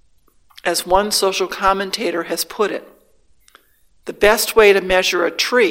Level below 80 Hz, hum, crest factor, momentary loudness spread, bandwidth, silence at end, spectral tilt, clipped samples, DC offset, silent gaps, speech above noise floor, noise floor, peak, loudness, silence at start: -42 dBFS; none; 18 dB; 11 LU; 17 kHz; 0 s; -2 dB/octave; under 0.1%; under 0.1%; none; 41 dB; -58 dBFS; 0 dBFS; -16 LUFS; 0.65 s